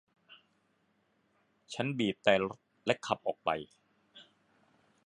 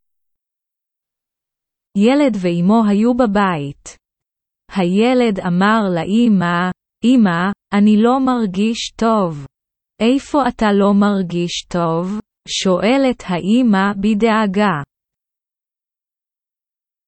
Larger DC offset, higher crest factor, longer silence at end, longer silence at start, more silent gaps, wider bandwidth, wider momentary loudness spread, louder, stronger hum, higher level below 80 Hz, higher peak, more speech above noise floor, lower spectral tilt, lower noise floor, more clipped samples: neither; first, 28 dB vs 16 dB; second, 0.85 s vs 2.25 s; second, 1.7 s vs 1.95 s; neither; first, 11 kHz vs 8.6 kHz; first, 11 LU vs 8 LU; second, -33 LUFS vs -16 LUFS; neither; second, -72 dBFS vs -48 dBFS; second, -10 dBFS vs 0 dBFS; second, 42 dB vs 75 dB; about the same, -5 dB/octave vs -6 dB/octave; second, -74 dBFS vs -90 dBFS; neither